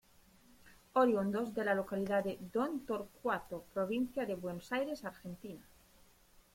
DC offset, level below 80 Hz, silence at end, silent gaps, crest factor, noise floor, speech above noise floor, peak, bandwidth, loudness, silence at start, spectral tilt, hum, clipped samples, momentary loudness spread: under 0.1%; -68 dBFS; 0.9 s; none; 20 dB; -65 dBFS; 29 dB; -18 dBFS; 16.5 kHz; -37 LUFS; 0.65 s; -6.5 dB/octave; none; under 0.1%; 15 LU